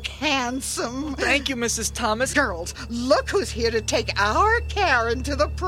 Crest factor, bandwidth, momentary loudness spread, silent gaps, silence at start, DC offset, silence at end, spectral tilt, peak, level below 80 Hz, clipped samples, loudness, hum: 18 dB; 16 kHz; 7 LU; none; 0 s; under 0.1%; 0 s; -3.5 dB/octave; -4 dBFS; -34 dBFS; under 0.1%; -22 LUFS; none